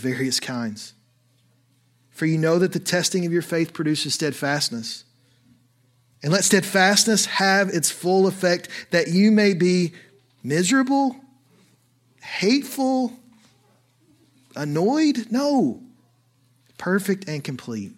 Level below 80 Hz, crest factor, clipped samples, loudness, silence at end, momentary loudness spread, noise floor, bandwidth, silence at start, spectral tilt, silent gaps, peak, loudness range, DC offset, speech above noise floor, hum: -72 dBFS; 20 dB; under 0.1%; -21 LUFS; 0.05 s; 14 LU; -62 dBFS; 16.5 kHz; 0 s; -4 dB/octave; none; -4 dBFS; 6 LU; under 0.1%; 41 dB; none